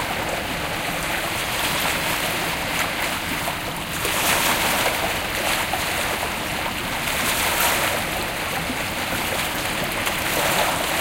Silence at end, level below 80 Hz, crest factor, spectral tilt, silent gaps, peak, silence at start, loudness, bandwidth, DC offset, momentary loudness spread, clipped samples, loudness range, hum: 0 s; -42 dBFS; 18 dB; -2 dB/octave; none; -6 dBFS; 0 s; -22 LUFS; 17 kHz; under 0.1%; 6 LU; under 0.1%; 1 LU; none